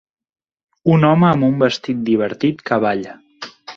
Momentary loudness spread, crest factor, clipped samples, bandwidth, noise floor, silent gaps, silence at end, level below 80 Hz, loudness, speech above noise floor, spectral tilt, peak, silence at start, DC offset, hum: 21 LU; 16 dB; under 0.1%; 7.4 kHz; -36 dBFS; none; 0.05 s; -54 dBFS; -16 LUFS; 20 dB; -7.5 dB/octave; -2 dBFS; 0.85 s; under 0.1%; none